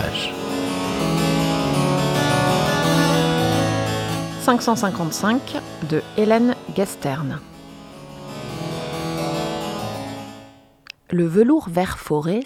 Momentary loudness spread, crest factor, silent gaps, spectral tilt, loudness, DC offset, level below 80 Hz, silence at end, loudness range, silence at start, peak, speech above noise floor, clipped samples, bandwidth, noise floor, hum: 16 LU; 18 dB; none; -5.5 dB/octave; -21 LUFS; under 0.1%; -46 dBFS; 0 s; 9 LU; 0 s; -4 dBFS; 26 dB; under 0.1%; 16.5 kHz; -46 dBFS; none